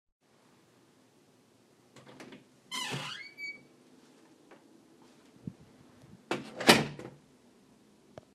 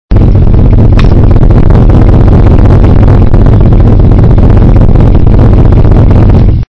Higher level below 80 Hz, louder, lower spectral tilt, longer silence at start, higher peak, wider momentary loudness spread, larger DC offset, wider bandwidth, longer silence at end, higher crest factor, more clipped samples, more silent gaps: second, -70 dBFS vs -4 dBFS; second, -30 LUFS vs -4 LUFS; second, -3 dB/octave vs -10.5 dB/octave; first, 1.95 s vs 0.1 s; second, -4 dBFS vs 0 dBFS; first, 31 LU vs 1 LU; neither; first, 15 kHz vs 5.6 kHz; first, 1.25 s vs 0.1 s; first, 34 dB vs 2 dB; second, under 0.1% vs 40%; neither